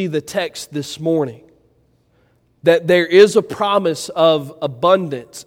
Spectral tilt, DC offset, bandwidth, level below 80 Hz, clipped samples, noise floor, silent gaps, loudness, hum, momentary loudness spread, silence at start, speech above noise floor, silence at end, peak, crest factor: -5 dB/octave; under 0.1%; 16.5 kHz; -60 dBFS; under 0.1%; -58 dBFS; none; -16 LUFS; none; 15 LU; 0 s; 42 dB; 0.05 s; 0 dBFS; 18 dB